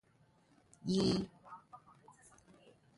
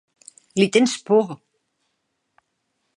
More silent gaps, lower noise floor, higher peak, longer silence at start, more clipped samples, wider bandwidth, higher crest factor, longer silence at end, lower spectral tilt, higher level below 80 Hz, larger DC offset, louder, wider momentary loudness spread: neither; second, -70 dBFS vs -74 dBFS; second, -22 dBFS vs -2 dBFS; first, 0.85 s vs 0.55 s; neither; about the same, 11.5 kHz vs 11.5 kHz; about the same, 20 dB vs 22 dB; second, 1.2 s vs 1.65 s; first, -6 dB/octave vs -4.5 dB/octave; first, -66 dBFS vs -76 dBFS; neither; second, -36 LUFS vs -20 LUFS; first, 25 LU vs 13 LU